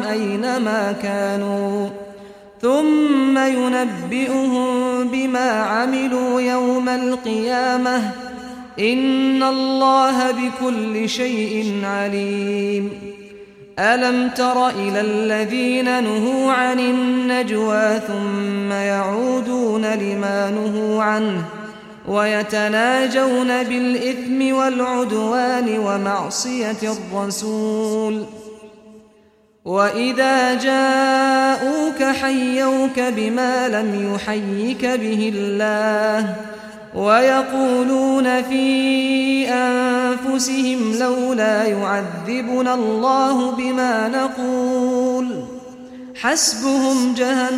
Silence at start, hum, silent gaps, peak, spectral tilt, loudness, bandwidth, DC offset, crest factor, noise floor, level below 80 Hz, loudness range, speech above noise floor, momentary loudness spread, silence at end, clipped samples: 0 s; none; none; -4 dBFS; -4 dB/octave; -18 LUFS; 14.5 kHz; under 0.1%; 16 dB; -54 dBFS; -60 dBFS; 3 LU; 36 dB; 7 LU; 0 s; under 0.1%